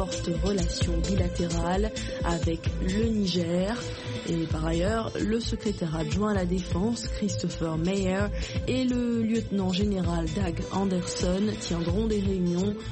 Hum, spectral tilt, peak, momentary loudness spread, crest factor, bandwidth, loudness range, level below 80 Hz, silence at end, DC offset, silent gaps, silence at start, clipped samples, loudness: none; -6 dB/octave; -14 dBFS; 4 LU; 14 dB; 8.8 kHz; 1 LU; -36 dBFS; 0 s; under 0.1%; none; 0 s; under 0.1%; -28 LUFS